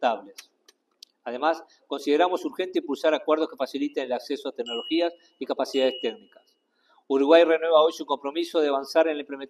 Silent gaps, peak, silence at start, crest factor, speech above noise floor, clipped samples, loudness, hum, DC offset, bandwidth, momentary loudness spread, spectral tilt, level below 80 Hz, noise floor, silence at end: none; -4 dBFS; 0 s; 22 dB; 41 dB; under 0.1%; -25 LUFS; none; under 0.1%; 13.5 kHz; 13 LU; -3 dB/octave; -82 dBFS; -66 dBFS; 0.05 s